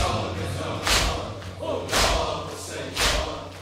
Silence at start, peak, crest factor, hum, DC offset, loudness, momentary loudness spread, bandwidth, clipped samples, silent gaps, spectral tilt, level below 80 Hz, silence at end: 0 s; -8 dBFS; 18 dB; none; under 0.1%; -25 LUFS; 11 LU; 16 kHz; under 0.1%; none; -3 dB/octave; -34 dBFS; 0 s